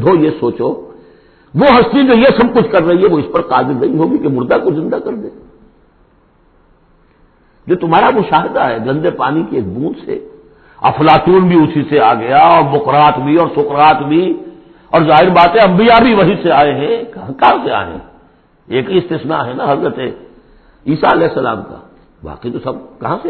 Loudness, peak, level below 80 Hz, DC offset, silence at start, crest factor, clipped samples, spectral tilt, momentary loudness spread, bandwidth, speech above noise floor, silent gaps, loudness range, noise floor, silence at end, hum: -11 LUFS; 0 dBFS; -42 dBFS; under 0.1%; 0 s; 12 dB; under 0.1%; -9.5 dB/octave; 15 LU; 4.6 kHz; 39 dB; none; 8 LU; -50 dBFS; 0 s; none